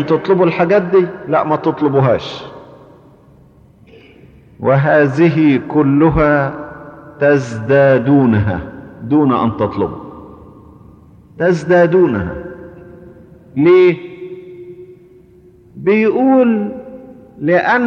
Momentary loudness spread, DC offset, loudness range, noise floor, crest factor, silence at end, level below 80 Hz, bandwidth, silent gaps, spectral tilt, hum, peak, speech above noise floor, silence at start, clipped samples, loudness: 20 LU; under 0.1%; 5 LU; -45 dBFS; 12 dB; 0 s; -40 dBFS; 7.4 kHz; none; -8.5 dB/octave; none; -2 dBFS; 33 dB; 0 s; under 0.1%; -13 LUFS